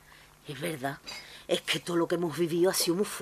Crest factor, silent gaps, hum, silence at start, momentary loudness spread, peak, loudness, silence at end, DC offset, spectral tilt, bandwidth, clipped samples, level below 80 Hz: 16 dB; none; 50 Hz at -60 dBFS; 0.45 s; 16 LU; -14 dBFS; -29 LUFS; 0 s; under 0.1%; -4 dB/octave; 15.5 kHz; under 0.1%; -66 dBFS